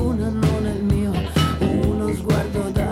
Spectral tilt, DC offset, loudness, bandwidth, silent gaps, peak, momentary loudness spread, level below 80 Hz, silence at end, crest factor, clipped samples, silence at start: -7 dB/octave; under 0.1%; -21 LUFS; 16 kHz; none; -6 dBFS; 3 LU; -30 dBFS; 0 s; 14 dB; under 0.1%; 0 s